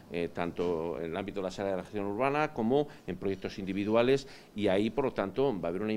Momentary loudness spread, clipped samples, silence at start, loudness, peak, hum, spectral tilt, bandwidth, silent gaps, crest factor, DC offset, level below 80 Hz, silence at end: 8 LU; under 0.1%; 0 s; -32 LUFS; -12 dBFS; none; -6.5 dB/octave; 12.5 kHz; none; 20 dB; under 0.1%; -56 dBFS; 0 s